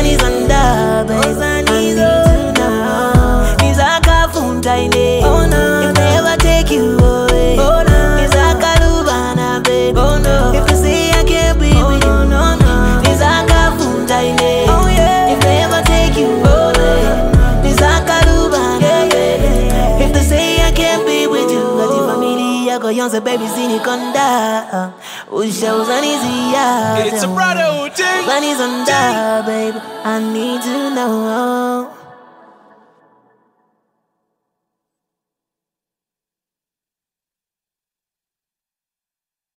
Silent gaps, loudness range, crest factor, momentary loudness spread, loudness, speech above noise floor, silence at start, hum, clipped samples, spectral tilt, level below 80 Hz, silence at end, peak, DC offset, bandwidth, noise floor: none; 5 LU; 12 dB; 6 LU; -13 LUFS; over 75 dB; 0 s; none; under 0.1%; -5 dB/octave; -18 dBFS; 7.65 s; 0 dBFS; under 0.1%; 16.5 kHz; under -90 dBFS